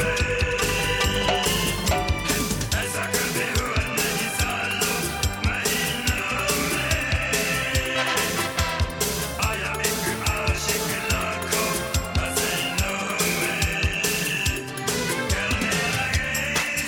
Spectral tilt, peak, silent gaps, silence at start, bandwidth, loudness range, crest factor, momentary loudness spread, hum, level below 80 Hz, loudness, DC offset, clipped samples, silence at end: -3 dB/octave; -8 dBFS; none; 0 s; 17.5 kHz; 1 LU; 16 dB; 3 LU; none; -34 dBFS; -23 LUFS; under 0.1%; under 0.1%; 0 s